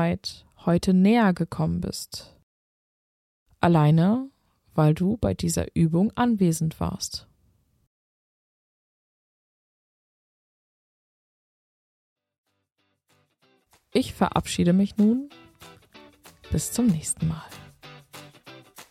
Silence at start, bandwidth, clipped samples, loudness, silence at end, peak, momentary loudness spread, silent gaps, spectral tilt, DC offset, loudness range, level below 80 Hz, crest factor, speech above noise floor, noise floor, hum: 0 s; 15 kHz; under 0.1%; -24 LUFS; 0.1 s; -6 dBFS; 18 LU; 2.43-3.46 s, 7.87-12.16 s, 12.38-12.44 s; -6 dB/octave; under 0.1%; 8 LU; -48 dBFS; 20 dB; 45 dB; -68 dBFS; none